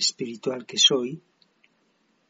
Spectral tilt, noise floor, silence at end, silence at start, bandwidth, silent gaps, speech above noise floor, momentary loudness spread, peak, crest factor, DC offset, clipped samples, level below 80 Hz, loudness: -1.5 dB/octave; -68 dBFS; 1.1 s; 0 s; 8 kHz; none; 43 dB; 16 LU; -6 dBFS; 22 dB; under 0.1%; under 0.1%; -82 dBFS; -22 LUFS